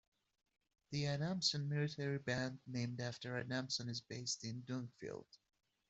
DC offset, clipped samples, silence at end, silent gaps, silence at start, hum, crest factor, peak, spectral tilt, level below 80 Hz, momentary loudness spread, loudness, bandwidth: under 0.1%; under 0.1%; 0.55 s; none; 0.9 s; none; 20 dB; -24 dBFS; -4.5 dB/octave; -76 dBFS; 10 LU; -42 LUFS; 8.2 kHz